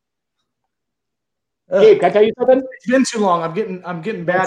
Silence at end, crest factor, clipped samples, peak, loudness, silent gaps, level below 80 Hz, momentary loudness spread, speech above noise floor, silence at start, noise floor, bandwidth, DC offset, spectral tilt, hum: 0 s; 16 dB; under 0.1%; 0 dBFS; -16 LUFS; none; -64 dBFS; 13 LU; 66 dB; 1.7 s; -81 dBFS; 10 kHz; under 0.1%; -5 dB/octave; none